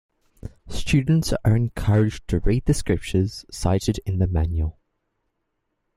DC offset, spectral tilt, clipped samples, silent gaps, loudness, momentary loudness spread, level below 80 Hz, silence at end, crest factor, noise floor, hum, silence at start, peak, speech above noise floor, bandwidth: under 0.1%; -6.5 dB/octave; under 0.1%; none; -23 LUFS; 11 LU; -34 dBFS; 1.25 s; 16 dB; -76 dBFS; none; 0.45 s; -6 dBFS; 55 dB; 14.5 kHz